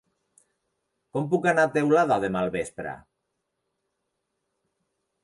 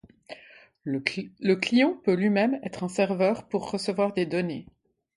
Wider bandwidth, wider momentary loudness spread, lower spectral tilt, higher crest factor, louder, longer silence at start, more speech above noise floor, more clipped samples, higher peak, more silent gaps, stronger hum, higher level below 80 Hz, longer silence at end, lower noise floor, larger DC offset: about the same, 11.5 kHz vs 11.5 kHz; about the same, 15 LU vs 17 LU; about the same, -6.5 dB/octave vs -6 dB/octave; second, 18 dB vs 24 dB; about the same, -24 LUFS vs -26 LUFS; first, 1.15 s vs 0.3 s; first, 56 dB vs 28 dB; neither; second, -10 dBFS vs -4 dBFS; neither; neither; about the same, -62 dBFS vs -66 dBFS; first, 2.25 s vs 0.55 s; first, -80 dBFS vs -53 dBFS; neither